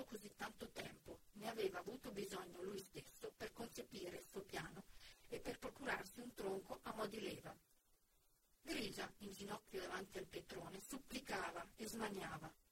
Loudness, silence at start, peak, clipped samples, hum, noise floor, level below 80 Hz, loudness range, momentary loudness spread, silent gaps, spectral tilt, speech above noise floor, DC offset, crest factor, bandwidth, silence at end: -51 LUFS; 0 s; -32 dBFS; under 0.1%; none; -78 dBFS; -72 dBFS; 2 LU; 9 LU; none; -3.5 dB/octave; 27 dB; under 0.1%; 20 dB; 16.5 kHz; 0.1 s